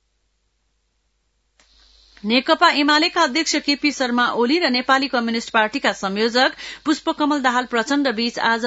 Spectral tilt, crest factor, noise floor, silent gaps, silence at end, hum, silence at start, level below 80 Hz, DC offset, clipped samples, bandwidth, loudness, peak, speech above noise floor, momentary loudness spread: -2.5 dB/octave; 20 dB; -68 dBFS; none; 0 s; none; 2.25 s; -60 dBFS; under 0.1%; under 0.1%; 8 kHz; -18 LUFS; 0 dBFS; 49 dB; 6 LU